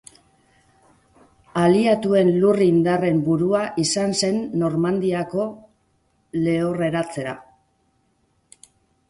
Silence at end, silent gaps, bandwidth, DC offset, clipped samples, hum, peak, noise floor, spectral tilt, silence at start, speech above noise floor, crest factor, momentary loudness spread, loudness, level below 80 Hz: 1.7 s; none; 11.5 kHz; under 0.1%; under 0.1%; none; -6 dBFS; -66 dBFS; -5.5 dB/octave; 1.55 s; 46 dB; 16 dB; 12 LU; -20 LUFS; -58 dBFS